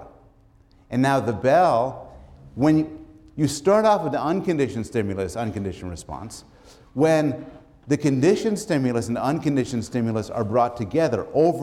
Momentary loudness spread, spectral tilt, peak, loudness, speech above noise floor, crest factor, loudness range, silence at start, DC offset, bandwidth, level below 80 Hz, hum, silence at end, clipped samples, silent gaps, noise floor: 16 LU; -6.5 dB/octave; -8 dBFS; -22 LUFS; 33 dB; 16 dB; 4 LU; 0 s; under 0.1%; 14.5 kHz; -52 dBFS; none; 0 s; under 0.1%; none; -55 dBFS